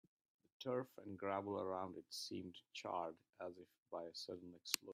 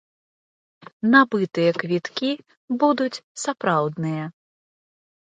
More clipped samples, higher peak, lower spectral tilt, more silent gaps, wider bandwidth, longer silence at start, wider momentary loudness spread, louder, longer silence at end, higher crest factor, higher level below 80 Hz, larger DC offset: neither; second, -16 dBFS vs 0 dBFS; second, -3.5 dB/octave vs -5.5 dB/octave; second, 3.78-3.86 s vs 2.57-2.68 s, 3.24-3.35 s; first, 15.5 kHz vs 9.4 kHz; second, 0.6 s vs 1.05 s; second, 10 LU vs 13 LU; second, -48 LUFS vs -22 LUFS; second, 0 s vs 0.95 s; first, 32 dB vs 22 dB; second, under -90 dBFS vs -72 dBFS; neither